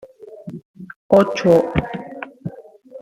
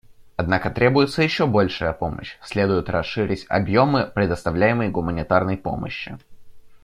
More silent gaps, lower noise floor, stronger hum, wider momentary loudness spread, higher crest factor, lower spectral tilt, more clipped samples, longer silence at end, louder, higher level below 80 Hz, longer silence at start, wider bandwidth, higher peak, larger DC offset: first, 0.65-0.74 s, 0.96-1.09 s vs none; about the same, -40 dBFS vs -40 dBFS; neither; first, 23 LU vs 11 LU; about the same, 20 dB vs 20 dB; about the same, -7 dB/octave vs -7 dB/octave; neither; about the same, 0 s vs 0.05 s; first, -17 LUFS vs -21 LUFS; about the same, -44 dBFS vs -44 dBFS; about the same, 0.2 s vs 0.1 s; first, 15 kHz vs 12.5 kHz; about the same, 0 dBFS vs -2 dBFS; neither